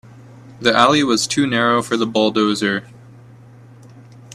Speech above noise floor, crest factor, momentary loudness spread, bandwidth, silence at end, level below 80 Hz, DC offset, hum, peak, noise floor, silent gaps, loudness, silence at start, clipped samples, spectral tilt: 26 dB; 18 dB; 7 LU; 14 kHz; 0 s; -58 dBFS; under 0.1%; none; 0 dBFS; -42 dBFS; none; -16 LUFS; 0.35 s; under 0.1%; -4 dB/octave